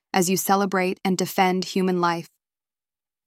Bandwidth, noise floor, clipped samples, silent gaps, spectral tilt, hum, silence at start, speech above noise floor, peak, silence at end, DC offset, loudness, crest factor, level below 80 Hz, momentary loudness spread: 16.5 kHz; under -90 dBFS; under 0.1%; none; -4.5 dB/octave; none; 0.15 s; over 68 dB; -6 dBFS; 1 s; under 0.1%; -22 LUFS; 18 dB; -68 dBFS; 4 LU